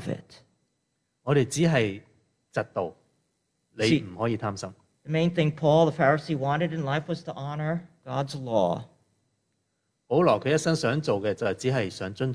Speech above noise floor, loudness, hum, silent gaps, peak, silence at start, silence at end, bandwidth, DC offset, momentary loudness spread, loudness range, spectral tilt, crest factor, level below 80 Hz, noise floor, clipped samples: 51 dB; -26 LUFS; none; none; -8 dBFS; 0 s; 0 s; 11 kHz; under 0.1%; 12 LU; 5 LU; -6 dB/octave; 18 dB; -62 dBFS; -77 dBFS; under 0.1%